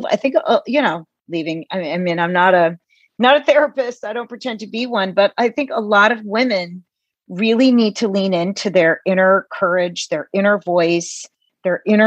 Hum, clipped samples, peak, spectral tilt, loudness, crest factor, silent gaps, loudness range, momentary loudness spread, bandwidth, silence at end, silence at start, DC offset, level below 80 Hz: none; under 0.1%; 0 dBFS; -5 dB/octave; -17 LUFS; 16 dB; none; 2 LU; 12 LU; 9 kHz; 0 s; 0 s; under 0.1%; -72 dBFS